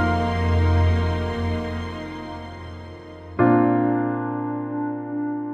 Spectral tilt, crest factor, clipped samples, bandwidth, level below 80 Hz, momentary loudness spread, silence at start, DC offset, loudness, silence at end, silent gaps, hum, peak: -8.5 dB/octave; 18 dB; under 0.1%; 7.6 kHz; -36 dBFS; 17 LU; 0 s; under 0.1%; -23 LUFS; 0 s; none; none; -6 dBFS